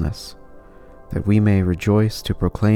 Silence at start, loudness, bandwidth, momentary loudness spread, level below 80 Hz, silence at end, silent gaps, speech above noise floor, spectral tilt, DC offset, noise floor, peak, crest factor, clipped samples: 0 s; -19 LUFS; 14 kHz; 14 LU; -36 dBFS; 0 s; none; 25 dB; -7.5 dB/octave; under 0.1%; -43 dBFS; -4 dBFS; 16 dB; under 0.1%